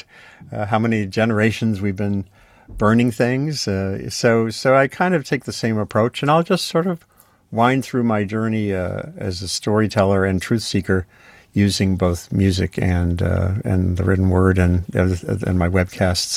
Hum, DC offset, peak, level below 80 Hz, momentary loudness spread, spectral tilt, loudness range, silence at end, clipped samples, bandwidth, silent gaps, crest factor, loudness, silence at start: none; under 0.1%; -2 dBFS; -46 dBFS; 8 LU; -6 dB/octave; 2 LU; 0 s; under 0.1%; 15 kHz; none; 16 dB; -19 LUFS; 0.4 s